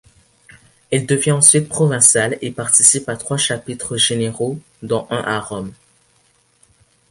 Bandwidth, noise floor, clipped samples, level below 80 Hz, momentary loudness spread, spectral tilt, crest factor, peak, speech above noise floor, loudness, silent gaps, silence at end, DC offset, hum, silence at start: 16 kHz; -58 dBFS; under 0.1%; -54 dBFS; 14 LU; -3 dB/octave; 18 dB; 0 dBFS; 41 dB; -15 LUFS; none; 1.4 s; under 0.1%; none; 0.9 s